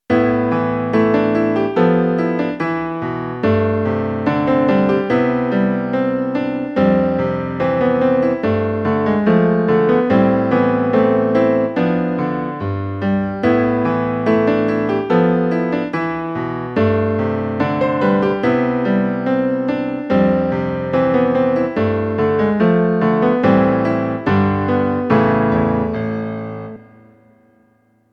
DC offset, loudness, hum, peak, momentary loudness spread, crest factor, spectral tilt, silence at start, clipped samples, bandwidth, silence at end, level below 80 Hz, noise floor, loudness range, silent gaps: under 0.1%; -17 LUFS; none; 0 dBFS; 6 LU; 16 dB; -9.5 dB/octave; 0.1 s; under 0.1%; 6.2 kHz; 1.3 s; -46 dBFS; -57 dBFS; 3 LU; none